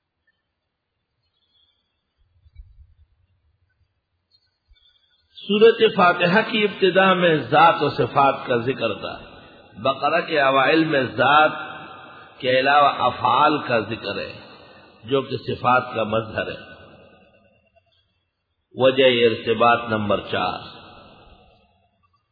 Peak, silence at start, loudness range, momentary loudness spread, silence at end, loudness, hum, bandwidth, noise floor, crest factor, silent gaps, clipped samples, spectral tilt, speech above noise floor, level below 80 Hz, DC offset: -4 dBFS; 2.6 s; 8 LU; 16 LU; 1.5 s; -19 LUFS; none; 5 kHz; -77 dBFS; 18 dB; none; under 0.1%; -8 dB/octave; 58 dB; -58 dBFS; under 0.1%